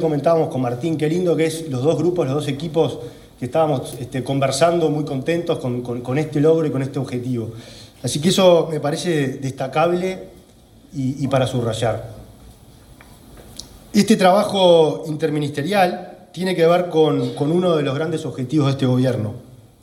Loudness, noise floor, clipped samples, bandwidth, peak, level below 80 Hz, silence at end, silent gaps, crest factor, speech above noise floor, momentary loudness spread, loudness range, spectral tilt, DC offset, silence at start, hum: -19 LUFS; -48 dBFS; under 0.1%; 16 kHz; -2 dBFS; -52 dBFS; 0.25 s; none; 18 dB; 29 dB; 14 LU; 5 LU; -6 dB/octave; under 0.1%; 0 s; none